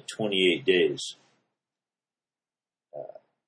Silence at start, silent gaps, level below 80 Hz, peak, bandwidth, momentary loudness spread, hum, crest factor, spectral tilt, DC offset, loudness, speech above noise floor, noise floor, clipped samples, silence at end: 0.1 s; none; -74 dBFS; -10 dBFS; 10.5 kHz; 21 LU; none; 20 dB; -4 dB/octave; under 0.1%; -25 LUFS; over 65 dB; under -90 dBFS; under 0.1%; 0.35 s